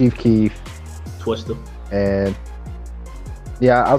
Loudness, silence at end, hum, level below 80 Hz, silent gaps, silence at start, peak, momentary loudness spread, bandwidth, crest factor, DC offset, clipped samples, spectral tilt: -20 LUFS; 0 s; none; -34 dBFS; none; 0 s; -2 dBFS; 19 LU; 13.5 kHz; 18 dB; under 0.1%; under 0.1%; -8 dB/octave